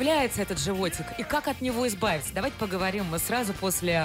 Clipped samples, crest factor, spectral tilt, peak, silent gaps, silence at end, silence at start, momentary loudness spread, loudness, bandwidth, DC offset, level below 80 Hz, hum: under 0.1%; 14 dB; -4 dB/octave; -14 dBFS; none; 0 s; 0 s; 5 LU; -28 LUFS; 16 kHz; under 0.1%; -48 dBFS; none